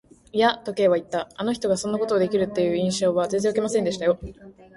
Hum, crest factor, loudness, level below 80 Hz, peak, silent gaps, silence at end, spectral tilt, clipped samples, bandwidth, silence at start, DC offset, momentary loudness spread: none; 18 dB; -23 LUFS; -54 dBFS; -6 dBFS; none; 0.25 s; -5 dB/octave; under 0.1%; 11.5 kHz; 0.35 s; under 0.1%; 6 LU